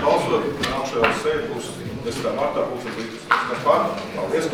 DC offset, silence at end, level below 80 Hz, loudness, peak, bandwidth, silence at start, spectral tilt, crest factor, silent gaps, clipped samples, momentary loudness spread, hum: 0.2%; 0 s; -50 dBFS; -23 LUFS; 0 dBFS; 17.5 kHz; 0 s; -4.5 dB/octave; 22 dB; none; under 0.1%; 10 LU; none